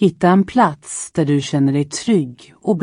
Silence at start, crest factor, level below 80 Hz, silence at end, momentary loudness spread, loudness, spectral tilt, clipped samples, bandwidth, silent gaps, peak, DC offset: 0 s; 14 dB; -54 dBFS; 0 s; 11 LU; -17 LUFS; -6 dB/octave; under 0.1%; 11 kHz; none; -2 dBFS; under 0.1%